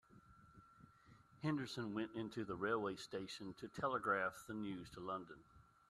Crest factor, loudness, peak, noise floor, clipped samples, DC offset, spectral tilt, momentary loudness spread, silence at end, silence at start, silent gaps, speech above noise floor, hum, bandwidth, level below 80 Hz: 20 dB; -44 LUFS; -26 dBFS; -67 dBFS; under 0.1%; under 0.1%; -5.5 dB/octave; 11 LU; 0.3 s; 0.1 s; none; 23 dB; none; 13 kHz; -74 dBFS